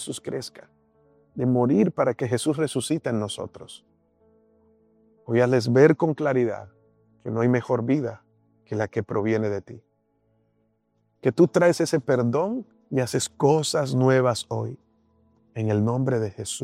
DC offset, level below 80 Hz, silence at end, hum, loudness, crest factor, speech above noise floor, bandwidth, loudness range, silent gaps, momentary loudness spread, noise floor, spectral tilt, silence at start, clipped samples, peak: under 0.1%; -66 dBFS; 0 s; none; -23 LUFS; 22 dB; 47 dB; 14.5 kHz; 6 LU; none; 14 LU; -70 dBFS; -6 dB/octave; 0 s; under 0.1%; -4 dBFS